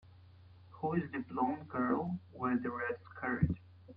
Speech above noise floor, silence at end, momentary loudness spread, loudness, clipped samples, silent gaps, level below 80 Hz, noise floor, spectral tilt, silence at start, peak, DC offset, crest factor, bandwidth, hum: 22 dB; 0 s; 6 LU; -37 LUFS; under 0.1%; none; -58 dBFS; -58 dBFS; -11 dB/octave; 0.05 s; -18 dBFS; under 0.1%; 20 dB; 5 kHz; none